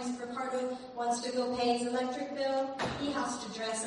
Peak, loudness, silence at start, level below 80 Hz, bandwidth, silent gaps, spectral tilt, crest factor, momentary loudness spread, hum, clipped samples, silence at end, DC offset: -18 dBFS; -34 LUFS; 0 s; -64 dBFS; 11.5 kHz; none; -3.5 dB/octave; 16 dB; 6 LU; none; under 0.1%; 0 s; under 0.1%